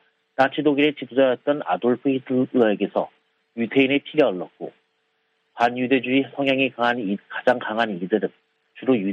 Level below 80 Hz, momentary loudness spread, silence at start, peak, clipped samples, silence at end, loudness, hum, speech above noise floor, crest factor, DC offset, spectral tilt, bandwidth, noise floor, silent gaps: -72 dBFS; 10 LU; 0.4 s; -4 dBFS; under 0.1%; 0 s; -22 LUFS; none; 49 dB; 18 dB; under 0.1%; -7 dB/octave; 6.8 kHz; -70 dBFS; none